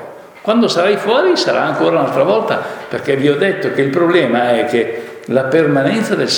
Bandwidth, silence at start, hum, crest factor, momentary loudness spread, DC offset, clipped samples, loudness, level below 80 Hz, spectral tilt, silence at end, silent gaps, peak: 19.5 kHz; 0 s; none; 14 dB; 8 LU; under 0.1%; under 0.1%; -14 LUFS; -64 dBFS; -5 dB/octave; 0 s; none; 0 dBFS